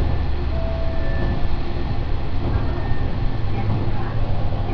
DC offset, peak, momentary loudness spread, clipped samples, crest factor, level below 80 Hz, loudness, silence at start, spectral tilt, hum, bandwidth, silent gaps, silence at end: under 0.1%; -6 dBFS; 3 LU; under 0.1%; 12 dB; -22 dBFS; -25 LUFS; 0 s; -9 dB/octave; none; 5.4 kHz; none; 0 s